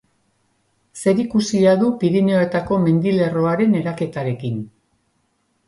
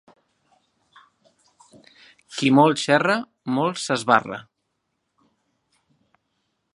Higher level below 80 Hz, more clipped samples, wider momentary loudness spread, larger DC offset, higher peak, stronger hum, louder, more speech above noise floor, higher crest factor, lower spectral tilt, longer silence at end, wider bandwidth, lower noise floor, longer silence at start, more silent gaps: first, -54 dBFS vs -72 dBFS; neither; second, 9 LU vs 16 LU; neither; second, -4 dBFS vs 0 dBFS; neither; about the same, -18 LUFS vs -20 LUFS; second, 49 dB vs 56 dB; second, 16 dB vs 24 dB; first, -7 dB/octave vs -5 dB/octave; second, 1 s vs 2.35 s; about the same, 11.5 kHz vs 11.5 kHz; second, -66 dBFS vs -76 dBFS; second, 0.95 s vs 2.3 s; neither